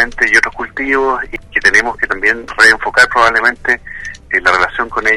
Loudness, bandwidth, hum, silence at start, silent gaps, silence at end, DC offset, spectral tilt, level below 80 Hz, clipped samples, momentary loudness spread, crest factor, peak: -11 LUFS; 15 kHz; none; 0 s; none; 0 s; under 0.1%; -2 dB/octave; -36 dBFS; under 0.1%; 9 LU; 12 dB; 0 dBFS